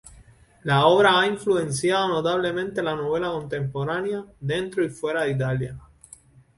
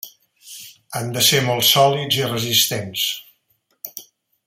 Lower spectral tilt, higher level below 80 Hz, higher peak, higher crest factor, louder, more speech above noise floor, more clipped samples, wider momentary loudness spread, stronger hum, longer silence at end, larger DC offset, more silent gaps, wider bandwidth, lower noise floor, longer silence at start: first, -5 dB/octave vs -2.5 dB/octave; first, -54 dBFS vs -62 dBFS; about the same, -4 dBFS vs -2 dBFS; about the same, 20 dB vs 20 dB; second, -23 LUFS vs -17 LUFS; second, 29 dB vs 48 dB; neither; second, 12 LU vs 22 LU; neither; first, 0.75 s vs 0.45 s; neither; neither; second, 11.5 kHz vs 16.5 kHz; second, -52 dBFS vs -66 dBFS; about the same, 0.05 s vs 0.05 s